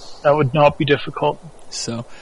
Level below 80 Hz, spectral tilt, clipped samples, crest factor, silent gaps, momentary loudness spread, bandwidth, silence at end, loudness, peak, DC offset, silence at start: -48 dBFS; -5.5 dB/octave; under 0.1%; 18 dB; none; 13 LU; 11 kHz; 0 s; -18 LUFS; -2 dBFS; under 0.1%; 0 s